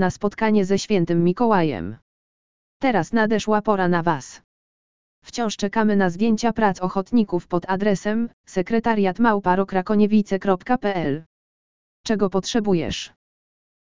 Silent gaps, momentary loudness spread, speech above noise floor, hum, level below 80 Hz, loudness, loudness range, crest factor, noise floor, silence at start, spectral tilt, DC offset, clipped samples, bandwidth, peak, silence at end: 2.02-2.80 s, 4.44-5.22 s, 8.33-8.44 s, 11.26-12.04 s; 8 LU; over 70 dB; none; -50 dBFS; -21 LUFS; 3 LU; 18 dB; under -90 dBFS; 0 s; -6 dB/octave; 2%; under 0.1%; 7.6 kHz; -4 dBFS; 0.7 s